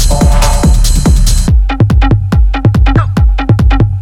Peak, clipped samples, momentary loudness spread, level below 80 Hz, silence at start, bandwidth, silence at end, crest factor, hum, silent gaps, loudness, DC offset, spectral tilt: 0 dBFS; 0.3%; 2 LU; -8 dBFS; 0 s; 15 kHz; 0 s; 6 dB; none; none; -10 LUFS; under 0.1%; -5.5 dB/octave